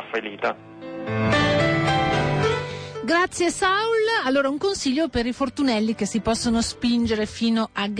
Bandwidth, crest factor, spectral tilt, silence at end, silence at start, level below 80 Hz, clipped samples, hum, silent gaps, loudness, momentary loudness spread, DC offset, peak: 10.5 kHz; 12 dB; -4.5 dB/octave; 0 s; 0 s; -44 dBFS; under 0.1%; none; none; -22 LUFS; 8 LU; under 0.1%; -10 dBFS